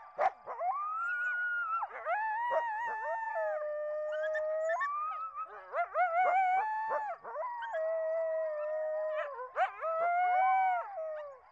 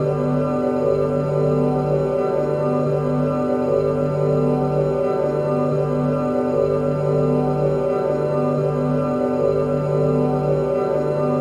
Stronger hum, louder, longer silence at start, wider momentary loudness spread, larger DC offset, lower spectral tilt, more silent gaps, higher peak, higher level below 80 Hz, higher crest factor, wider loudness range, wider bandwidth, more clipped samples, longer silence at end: neither; second, -34 LUFS vs -20 LUFS; about the same, 0 s vs 0 s; first, 10 LU vs 2 LU; neither; second, -2 dB/octave vs -9.5 dB/octave; neither; second, -20 dBFS vs -8 dBFS; second, -82 dBFS vs -44 dBFS; about the same, 14 dB vs 12 dB; first, 3 LU vs 0 LU; second, 7.8 kHz vs 10 kHz; neither; about the same, 0.1 s vs 0 s